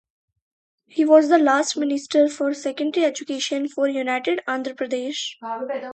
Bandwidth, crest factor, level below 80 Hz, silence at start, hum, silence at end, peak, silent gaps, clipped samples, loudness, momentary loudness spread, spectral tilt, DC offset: 9 kHz; 18 dB; -76 dBFS; 0.95 s; none; 0 s; -4 dBFS; none; under 0.1%; -21 LUFS; 12 LU; -2 dB/octave; under 0.1%